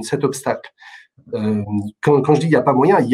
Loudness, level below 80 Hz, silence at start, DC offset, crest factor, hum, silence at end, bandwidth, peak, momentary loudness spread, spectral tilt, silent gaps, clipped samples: -17 LUFS; -60 dBFS; 0 s; under 0.1%; 16 dB; none; 0 s; 14.5 kHz; -2 dBFS; 10 LU; -7 dB/octave; none; under 0.1%